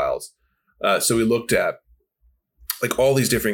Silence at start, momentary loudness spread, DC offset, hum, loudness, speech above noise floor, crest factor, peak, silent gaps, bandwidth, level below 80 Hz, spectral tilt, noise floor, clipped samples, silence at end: 0 s; 18 LU; under 0.1%; none; -21 LUFS; 46 dB; 20 dB; -4 dBFS; none; 19 kHz; -48 dBFS; -4 dB/octave; -65 dBFS; under 0.1%; 0 s